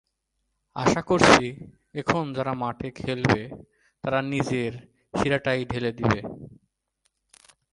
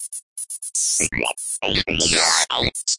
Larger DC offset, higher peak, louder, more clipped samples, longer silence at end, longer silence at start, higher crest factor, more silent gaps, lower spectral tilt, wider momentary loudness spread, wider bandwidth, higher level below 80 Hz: neither; about the same, 0 dBFS vs -2 dBFS; second, -24 LUFS vs -19 LUFS; neither; first, 1.2 s vs 0 s; first, 0.75 s vs 0 s; first, 26 dB vs 20 dB; second, none vs 0.23-0.36 s; first, -5 dB/octave vs -1 dB/octave; first, 20 LU vs 13 LU; about the same, 11.5 kHz vs 11.5 kHz; second, -50 dBFS vs -42 dBFS